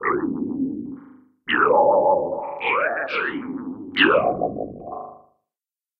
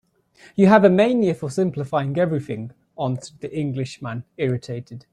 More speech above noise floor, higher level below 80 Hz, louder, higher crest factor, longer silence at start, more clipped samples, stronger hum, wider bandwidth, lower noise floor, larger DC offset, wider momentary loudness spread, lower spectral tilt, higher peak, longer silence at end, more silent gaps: first, over 69 dB vs 32 dB; about the same, -58 dBFS vs -60 dBFS; about the same, -21 LUFS vs -21 LUFS; about the same, 20 dB vs 20 dB; second, 0 s vs 0.55 s; neither; neither; second, 5.8 kHz vs 10.5 kHz; first, under -90 dBFS vs -52 dBFS; neither; about the same, 19 LU vs 18 LU; about the same, -7.5 dB/octave vs -7.5 dB/octave; about the same, -2 dBFS vs -2 dBFS; first, 0.85 s vs 0.1 s; neither